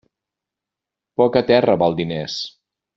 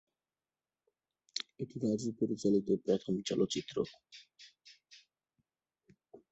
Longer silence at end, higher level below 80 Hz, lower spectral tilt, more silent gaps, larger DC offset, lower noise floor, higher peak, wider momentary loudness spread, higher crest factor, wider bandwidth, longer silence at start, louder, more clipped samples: first, 0.45 s vs 0.15 s; first, -56 dBFS vs -72 dBFS; about the same, -6 dB/octave vs -5.5 dB/octave; neither; neither; second, -86 dBFS vs under -90 dBFS; first, -2 dBFS vs -18 dBFS; second, 14 LU vs 23 LU; about the same, 18 dB vs 20 dB; about the same, 7.6 kHz vs 8.2 kHz; second, 1.2 s vs 1.35 s; first, -18 LUFS vs -35 LUFS; neither